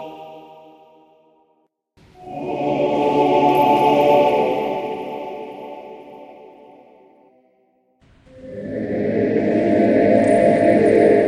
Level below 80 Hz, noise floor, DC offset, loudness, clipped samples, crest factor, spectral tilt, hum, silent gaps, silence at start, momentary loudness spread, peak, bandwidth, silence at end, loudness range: -54 dBFS; -64 dBFS; under 0.1%; -17 LUFS; under 0.1%; 16 dB; -7 dB/octave; none; none; 0 s; 21 LU; -2 dBFS; 13 kHz; 0 s; 18 LU